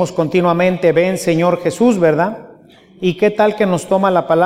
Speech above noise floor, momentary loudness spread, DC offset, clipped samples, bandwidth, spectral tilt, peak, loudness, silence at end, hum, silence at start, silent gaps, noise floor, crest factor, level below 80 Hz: 30 dB; 5 LU; under 0.1%; under 0.1%; 15.5 kHz; -6.5 dB/octave; 0 dBFS; -15 LUFS; 0 s; none; 0 s; none; -44 dBFS; 14 dB; -54 dBFS